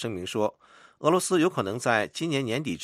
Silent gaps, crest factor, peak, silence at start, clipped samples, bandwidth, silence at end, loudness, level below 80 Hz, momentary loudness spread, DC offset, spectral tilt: none; 20 dB; -8 dBFS; 0 s; under 0.1%; 15 kHz; 0 s; -26 LUFS; -68 dBFS; 6 LU; under 0.1%; -4.5 dB/octave